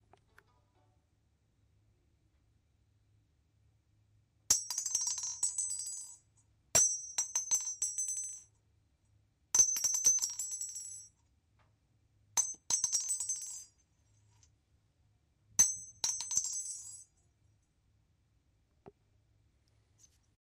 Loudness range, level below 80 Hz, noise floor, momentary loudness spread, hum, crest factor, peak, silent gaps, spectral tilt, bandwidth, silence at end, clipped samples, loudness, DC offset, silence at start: 6 LU; -72 dBFS; -74 dBFS; 17 LU; none; 26 dB; -14 dBFS; none; 1.5 dB/octave; 15.5 kHz; 1.55 s; under 0.1%; -32 LUFS; under 0.1%; 4.5 s